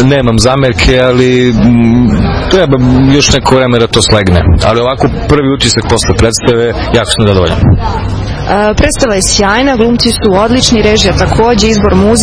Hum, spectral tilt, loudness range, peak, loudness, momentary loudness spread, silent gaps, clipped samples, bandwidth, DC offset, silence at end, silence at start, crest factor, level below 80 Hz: none; -5 dB/octave; 2 LU; 0 dBFS; -8 LUFS; 4 LU; none; 2%; 11 kHz; under 0.1%; 0 s; 0 s; 8 dB; -18 dBFS